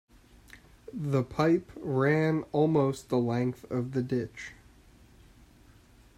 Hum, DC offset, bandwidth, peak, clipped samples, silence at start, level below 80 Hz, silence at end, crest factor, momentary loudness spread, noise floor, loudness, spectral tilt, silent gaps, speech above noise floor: none; under 0.1%; 14 kHz; -12 dBFS; under 0.1%; 0.55 s; -60 dBFS; 1.65 s; 18 dB; 15 LU; -57 dBFS; -29 LUFS; -8 dB/octave; none; 29 dB